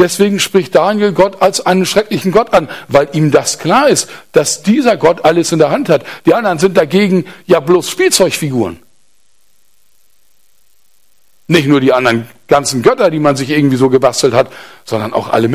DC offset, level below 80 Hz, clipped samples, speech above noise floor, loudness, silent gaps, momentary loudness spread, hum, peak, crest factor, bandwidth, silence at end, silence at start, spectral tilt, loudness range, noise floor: 0.5%; -48 dBFS; 0.1%; 47 dB; -11 LUFS; none; 5 LU; none; 0 dBFS; 12 dB; 15.5 kHz; 0 s; 0 s; -4.5 dB/octave; 5 LU; -58 dBFS